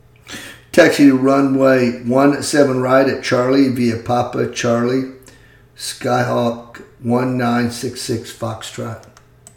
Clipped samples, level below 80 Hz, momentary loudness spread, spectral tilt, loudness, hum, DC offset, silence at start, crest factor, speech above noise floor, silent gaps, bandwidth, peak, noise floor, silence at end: under 0.1%; -54 dBFS; 16 LU; -5.5 dB/octave; -16 LUFS; none; under 0.1%; 0.25 s; 16 dB; 30 dB; none; 17.5 kHz; 0 dBFS; -46 dBFS; 0.55 s